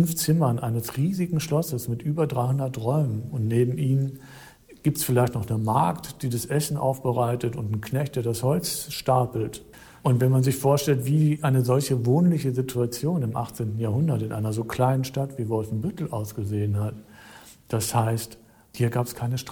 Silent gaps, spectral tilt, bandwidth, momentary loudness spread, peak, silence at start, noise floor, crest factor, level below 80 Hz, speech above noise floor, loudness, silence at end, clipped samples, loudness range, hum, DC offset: none; -6.5 dB/octave; 20 kHz; 8 LU; -10 dBFS; 0 s; -48 dBFS; 14 dB; -54 dBFS; 24 dB; -25 LUFS; 0 s; under 0.1%; 6 LU; none; under 0.1%